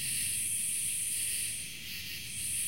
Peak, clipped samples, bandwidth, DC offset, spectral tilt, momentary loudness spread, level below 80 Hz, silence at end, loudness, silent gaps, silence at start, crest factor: -22 dBFS; under 0.1%; 16.5 kHz; 0.3%; 0.5 dB/octave; 8 LU; -62 dBFS; 0 s; -32 LUFS; none; 0 s; 14 dB